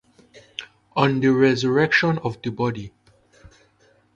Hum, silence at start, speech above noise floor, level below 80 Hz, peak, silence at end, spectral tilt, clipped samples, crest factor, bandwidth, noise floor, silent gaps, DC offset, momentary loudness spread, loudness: none; 0.35 s; 39 dB; -56 dBFS; -2 dBFS; 1.25 s; -6.5 dB/octave; under 0.1%; 20 dB; 8 kHz; -59 dBFS; none; under 0.1%; 19 LU; -20 LUFS